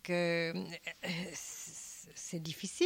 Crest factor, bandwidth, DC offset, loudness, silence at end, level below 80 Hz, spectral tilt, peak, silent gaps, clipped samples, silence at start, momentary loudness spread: 18 dB; 16.5 kHz; under 0.1%; -39 LUFS; 0 s; -74 dBFS; -4 dB/octave; -20 dBFS; none; under 0.1%; 0.05 s; 12 LU